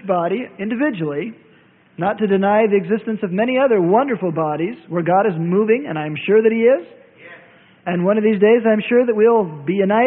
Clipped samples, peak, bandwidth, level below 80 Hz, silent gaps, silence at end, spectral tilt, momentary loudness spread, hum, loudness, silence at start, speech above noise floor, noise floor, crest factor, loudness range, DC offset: under 0.1%; -2 dBFS; 3.9 kHz; -64 dBFS; none; 0 s; -12 dB/octave; 10 LU; none; -17 LUFS; 0 s; 35 dB; -51 dBFS; 14 dB; 2 LU; under 0.1%